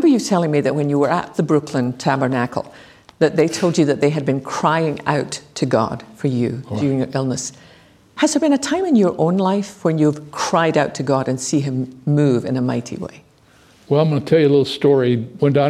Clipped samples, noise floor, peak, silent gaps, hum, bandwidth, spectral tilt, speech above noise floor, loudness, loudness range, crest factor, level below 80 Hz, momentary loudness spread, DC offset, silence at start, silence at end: under 0.1%; -51 dBFS; -2 dBFS; none; none; 13.5 kHz; -6 dB/octave; 33 dB; -18 LUFS; 3 LU; 16 dB; -58 dBFS; 8 LU; under 0.1%; 0 s; 0 s